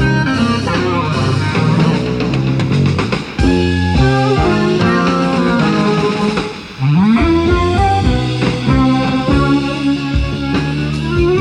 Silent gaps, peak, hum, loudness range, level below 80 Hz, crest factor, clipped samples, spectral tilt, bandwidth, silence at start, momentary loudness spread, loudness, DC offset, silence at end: none; 0 dBFS; none; 1 LU; -26 dBFS; 12 dB; under 0.1%; -7 dB/octave; 11 kHz; 0 s; 5 LU; -14 LUFS; under 0.1%; 0 s